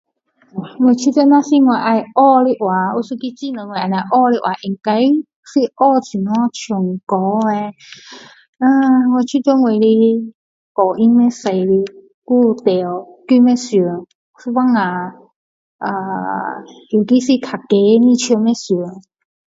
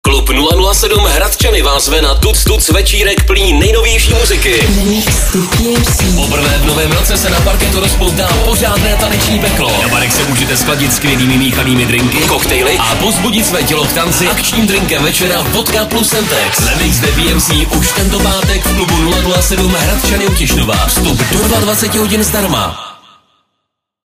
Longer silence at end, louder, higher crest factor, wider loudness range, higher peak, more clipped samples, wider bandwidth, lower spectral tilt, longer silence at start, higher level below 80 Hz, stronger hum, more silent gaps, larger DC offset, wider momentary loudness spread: second, 0.55 s vs 1.1 s; second, -15 LUFS vs -10 LUFS; about the same, 14 dB vs 10 dB; first, 4 LU vs 1 LU; about the same, 0 dBFS vs 0 dBFS; neither; second, 7.8 kHz vs 16 kHz; first, -6 dB/octave vs -3.5 dB/octave; first, 0.55 s vs 0.05 s; second, -66 dBFS vs -16 dBFS; neither; first, 5.36-5.43 s, 8.49-8.53 s, 10.35-10.75 s, 12.14-12.22 s, 14.15-14.34 s, 15.36-15.79 s vs none; neither; first, 13 LU vs 2 LU